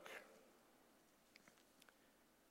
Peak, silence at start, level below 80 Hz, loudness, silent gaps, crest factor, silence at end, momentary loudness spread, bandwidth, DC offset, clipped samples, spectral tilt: -38 dBFS; 0 s; under -90 dBFS; -64 LUFS; none; 28 dB; 0 s; 11 LU; 16 kHz; under 0.1%; under 0.1%; -2 dB/octave